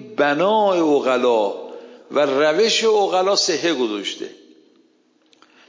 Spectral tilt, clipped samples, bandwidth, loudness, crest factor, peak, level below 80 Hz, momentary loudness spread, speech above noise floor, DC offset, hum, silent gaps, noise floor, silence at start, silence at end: -3 dB/octave; under 0.1%; 7.6 kHz; -18 LUFS; 14 dB; -6 dBFS; -76 dBFS; 11 LU; 42 dB; under 0.1%; none; none; -59 dBFS; 0 s; 1.35 s